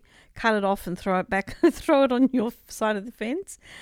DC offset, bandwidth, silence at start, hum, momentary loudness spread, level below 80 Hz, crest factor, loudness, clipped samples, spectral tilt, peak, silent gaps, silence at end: under 0.1%; 16.5 kHz; 0.35 s; none; 10 LU; -50 dBFS; 18 dB; -25 LUFS; under 0.1%; -5.5 dB/octave; -8 dBFS; none; 0 s